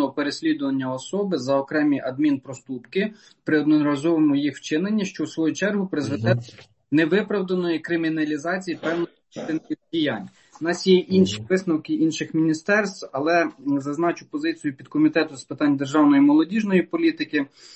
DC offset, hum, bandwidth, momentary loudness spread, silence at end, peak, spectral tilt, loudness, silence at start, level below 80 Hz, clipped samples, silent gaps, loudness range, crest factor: under 0.1%; none; 8.6 kHz; 10 LU; 0 s; -6 dBFS; -6 dB/octave; -23 LUFS; 0 s; -64 dBFS; under 0.1%; none; 4 LU; 16 dB